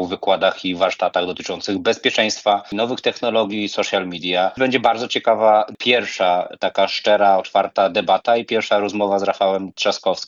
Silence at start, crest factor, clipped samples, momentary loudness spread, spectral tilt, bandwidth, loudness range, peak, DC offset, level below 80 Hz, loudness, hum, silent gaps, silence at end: 0 s; 16 dB; under 0.1%; 6 LU; -3.5 dB/octave; 7.6 kHz; 3 LU; -2 dBFS; under 0.1%; -66 dBFS; -18 LUFS; none; none; 0 s